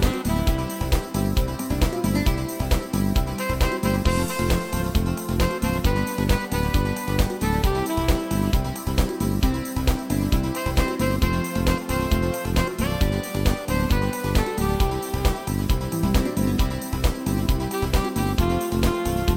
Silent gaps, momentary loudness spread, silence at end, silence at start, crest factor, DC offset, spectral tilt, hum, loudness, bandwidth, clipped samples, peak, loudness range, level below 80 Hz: none; 2 LU; 0 s; 0 s; 16 dB; under 0.1%; -5.5 dB/octave; none; -24 LUFS; 17 kHz; under 0.1%; -6 dBFS; 1 LU; -26 dBFS